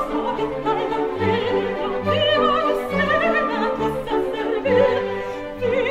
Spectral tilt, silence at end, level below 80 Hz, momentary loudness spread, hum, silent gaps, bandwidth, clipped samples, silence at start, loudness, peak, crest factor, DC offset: -6 dB/octave; 0 s; -44 dBFS; 6 LU; none; none; 15.5 kHz; under 0.1%; 0 s; -21 LUFS; -6 dBFS; 14 dB; under 0.1%